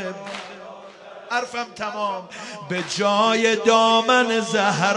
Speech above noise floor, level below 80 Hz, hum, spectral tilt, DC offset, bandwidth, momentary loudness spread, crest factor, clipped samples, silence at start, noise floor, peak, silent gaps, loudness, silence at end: 21 dB; -70 dBFS; none; -3.5 dB/octave; under 0.1%; 11.5 kHz; 22 LU; 18 dB; under 0.1%; 0 s; -41 dBFS; -4 dBFS; none; -20 LUFS; 0 s